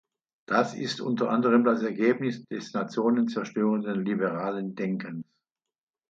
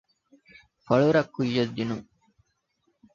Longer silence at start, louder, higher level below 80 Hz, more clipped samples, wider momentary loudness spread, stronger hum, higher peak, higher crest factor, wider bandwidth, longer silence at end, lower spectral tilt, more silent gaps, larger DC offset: second, 0.5 s vs 0.9 s; about the same, -27 LUFS vs -25 LUFS; second, -76 dBFS vs -62 dBFS; neither; about the same, 10 LU vs 11 LU; neither; about the same, -8 dBFS vs -6 dBFS; about the same, 18 dB vs 22 dB; about the same, 7.6 kHz vs 7.4 kHz; second, 0.9 s vs 1.1 s; about the same, -6.5 dB/octave vs -7 dB/octave; neither; neither